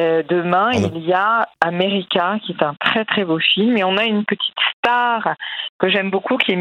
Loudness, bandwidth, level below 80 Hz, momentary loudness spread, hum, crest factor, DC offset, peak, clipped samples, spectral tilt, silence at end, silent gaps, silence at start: -17 LUFS; 9.6 kHz; -64 dBFS; 5 LU; none; 18 dB; under 0.1%; 0 dBFS; under 0.1%; -5.5 dB/octave; 0 s; 4.73-4.83 s, 5.69-5.79 s; 0 s